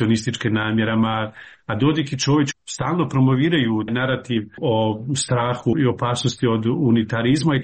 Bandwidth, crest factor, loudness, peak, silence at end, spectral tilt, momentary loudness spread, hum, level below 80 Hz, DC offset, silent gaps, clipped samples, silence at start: 8.8 kHz; 12 dB; -20 LUFS; -8 dBFS; 0 s; -5.5 dB/octave; 5 LU; none; -52 dBFS; under 0.1%; none; under 0.1%; 0 s